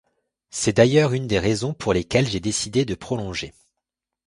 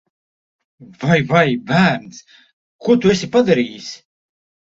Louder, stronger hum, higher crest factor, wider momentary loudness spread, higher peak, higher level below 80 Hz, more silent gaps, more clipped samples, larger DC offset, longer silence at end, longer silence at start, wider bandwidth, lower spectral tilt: second, -21 LUFS vs -16 LUFS; neither; about the same, 22 dB vs 18 dB; about the same, 13 LU vs 13 LU; about the same, -2 dBFS vs -2 dBFS; first, -46 dBFS vs -54 dBFS; second, none vs 2.53-2.79 s; neither; neither; about the same, 0.75 s vs 0.75 s; second, 0.55 s vs 1 s; first, 11.5 kHz vs 7.8 kHz; about the same, -5 dB/octave vs -6 dB/octave